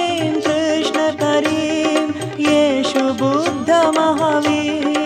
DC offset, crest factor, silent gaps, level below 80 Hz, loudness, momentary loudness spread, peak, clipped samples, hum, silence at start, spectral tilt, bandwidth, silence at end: under 0.1%; 12 dB; none; -58 dBFS; -17 LUFS; 4 LU; -4 dBFS; under 0.1%; none; 0 s; -4.5 dB/octave; 12.5 kHz; 0 s